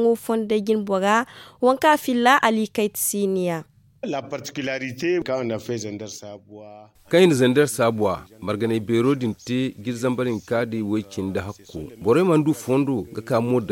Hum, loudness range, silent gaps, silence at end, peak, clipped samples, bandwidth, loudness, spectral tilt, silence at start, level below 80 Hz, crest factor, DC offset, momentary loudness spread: none; 6 LU; none; 0 s; -2 dBFS; under 0.1%; 17 kHz; -22 LUFS; -5 dB/octave; 0 s; -58 dBFS; 18 dB; under 0.1%; 14 LU